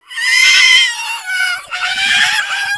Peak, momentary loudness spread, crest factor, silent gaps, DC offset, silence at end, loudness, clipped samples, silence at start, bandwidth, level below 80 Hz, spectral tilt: 0 dBFS; 12 LU; 14 dB; none; under 0.1%; 0 s; -10 LUFS; under 0.1%; 0.1 s; 11 kHz; -56 dBFS; 3.5 dB/octave